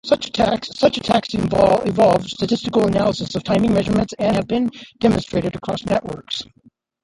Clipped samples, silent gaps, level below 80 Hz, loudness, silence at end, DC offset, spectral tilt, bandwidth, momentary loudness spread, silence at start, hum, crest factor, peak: under 0.1%; none; -44 dBFS; -19 LUFS; 0.6 s; under 0.1%; -6 dB/octave; 11.5 kHz; 9 LU; 0.05 s; none; 16 dB; -2 dBFS